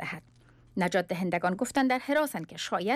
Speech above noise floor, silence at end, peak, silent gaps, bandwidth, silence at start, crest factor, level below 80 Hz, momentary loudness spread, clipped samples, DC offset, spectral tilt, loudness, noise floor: 30 dB; 0 s; -16 dBFS; none; 15.5 kHz; 0 s; 14 dB; -64 dBFS; 11 LU; under 0.1%; under 0.1%; -5 dB/octave; -29 LUFS; -58 dBFS